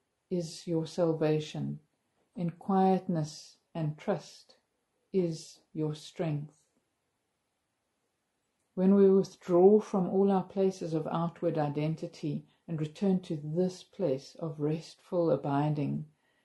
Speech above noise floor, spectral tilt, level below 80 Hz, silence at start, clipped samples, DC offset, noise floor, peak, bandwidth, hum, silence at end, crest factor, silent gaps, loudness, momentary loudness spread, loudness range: 51 dB; -8 dB/octave; -74 dBFS; 0.3 s; under 0.1%; under 0.1%; -81 dBFS; -10 dBFS; 11.5 kHz; none; 0.4 s; 20 dB; none; -31 LUFS; 15 LU; 11 LU